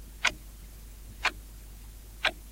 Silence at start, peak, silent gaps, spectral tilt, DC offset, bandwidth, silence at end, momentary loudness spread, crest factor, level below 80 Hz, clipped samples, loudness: 0 s; -10 dBFS; none; -1.5 dB/octave; under 0.1%; 16.5 kHz; 0 s; 19 LU; 26 dB; -46 dBFS; under 0.1%; -31 LUFS